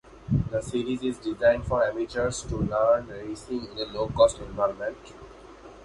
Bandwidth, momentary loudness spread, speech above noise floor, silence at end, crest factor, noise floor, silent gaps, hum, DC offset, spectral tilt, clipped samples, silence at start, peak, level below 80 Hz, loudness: 11.5 kHz; 19 LU; 21 dB; 0 s; 20 dB; -47 dBFS; none; none; under 0.1%; -5.5 dB/octave; under 0.1%; 0.05 s; -8 dBFS; -44 dBFS; -27 LUFS